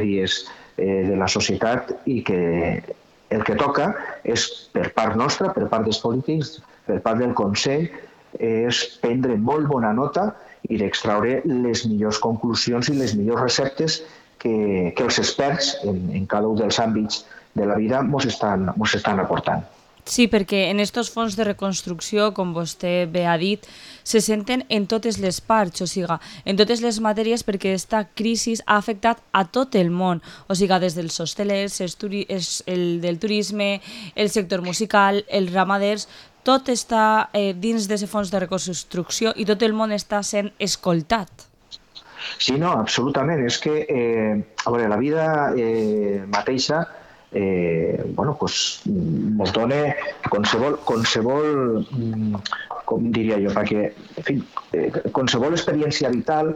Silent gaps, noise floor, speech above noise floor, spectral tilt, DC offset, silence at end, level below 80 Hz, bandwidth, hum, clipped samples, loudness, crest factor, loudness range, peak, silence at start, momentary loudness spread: none; -44 dBFS; 23 dB; -4.5 dB/octave; under 0.1%; 0 s; -52 dBFS; 15.5 kHz; none; under 0.1%; -22 LUFS; 20 dB; 2 LU; -2 dBFS; 0 s; 7 LU